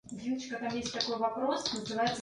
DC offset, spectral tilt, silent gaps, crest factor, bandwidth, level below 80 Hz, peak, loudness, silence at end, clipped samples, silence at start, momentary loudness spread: under 0.1%; -3.5 dB/octave; none; 18 dB; 11.5 kHz; -66 dBFS; -14 dBFS; -34 LUFS; 0 s; under 0.1%; 0.05 s; 5 LU